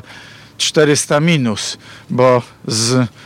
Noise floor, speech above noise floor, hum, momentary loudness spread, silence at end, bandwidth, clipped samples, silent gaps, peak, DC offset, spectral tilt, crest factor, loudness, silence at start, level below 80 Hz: -38 dBFS; 23 dB; none; 10 LU; 0.15 s; 16.5 kHz; under 0.1%; none; -2 dBFS; under 0.1%; -4 dB/octave; 14 dB; -15 LUFS; 0.1 s; -58 dBFS